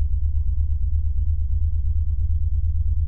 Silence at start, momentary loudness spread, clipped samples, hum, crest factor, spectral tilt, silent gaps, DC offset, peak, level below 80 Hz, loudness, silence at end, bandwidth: 0 s; 1 LU; under 0.1%; none; 8 dB; -11 dB/octave; none; 2%; -10 dBFS; -22 dBFS; -25 LUFS; 0 s; 0.4 kHz